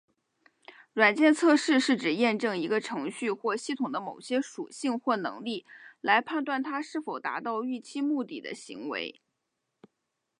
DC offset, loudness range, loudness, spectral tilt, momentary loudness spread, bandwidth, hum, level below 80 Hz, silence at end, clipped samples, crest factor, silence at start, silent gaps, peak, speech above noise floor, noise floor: under 0.1%; 8 LU; -29 LUFS; -4 dB/octave; 14 LU; 11 kHz; none; -84 dBFS; 1.3 s; under 0.1%; 22 dB; 0.7 s; none; -6 dBFS; 54 dB; -82 dBFS